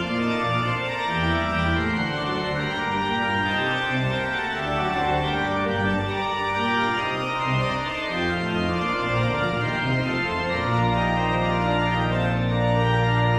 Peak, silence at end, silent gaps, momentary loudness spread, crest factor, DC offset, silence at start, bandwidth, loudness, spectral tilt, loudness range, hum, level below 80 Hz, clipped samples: -8 dBFS; 0 s; none; 3 LU; 14 dB; under 0.1%; 0 s; 10 kHz; -23 LUFS; -6.5 dB/octave; 1 LU; none; -40 dBFS; under 0.1%